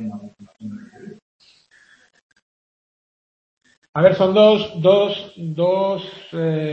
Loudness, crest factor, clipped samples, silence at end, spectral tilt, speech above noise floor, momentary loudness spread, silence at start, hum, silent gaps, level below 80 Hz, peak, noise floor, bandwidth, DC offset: -17 LUFS; 20 dB; under 0.1%; 0 s; -7.5 dB/octave; 37 dB; 22 LU; 0 s; none; 1.22-1.40 s, 2.22-2.30 s, 2.42-3.61 s, 3.77-3.82 s, 3.89-3.93 s; -64 dBFS; 0 dBFS; -54 dBFS; 6.8 kHz; under 0.1%